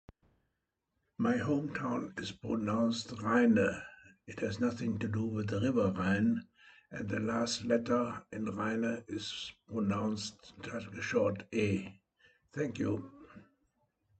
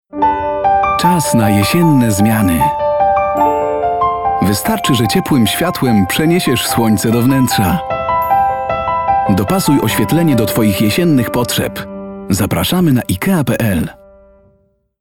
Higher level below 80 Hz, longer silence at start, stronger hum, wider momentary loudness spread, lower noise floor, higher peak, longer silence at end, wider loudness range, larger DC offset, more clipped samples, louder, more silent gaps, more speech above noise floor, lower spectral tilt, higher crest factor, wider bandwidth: second, -68 dBFS vs -38 dBFS; first, 1.2 s vs 0.15 s; neither; first, 12 LU vs 5 LU; first, -85 dBFS vs -56 dBFS; second, -18 dBFS vs 0 dBFS; second, 0.8 s vs 1.05 s; about the same, 4 LU vs 2 LU; neither; neither; second, -34 LUFS vs -13 LUFS; neither; first, 51 dB vs 44 dB; about the same, -6 dB/octave vs -5.5 dB/octave; first, 18 dB vs 12 dB; second, 8.8 kHz vs 18 kHz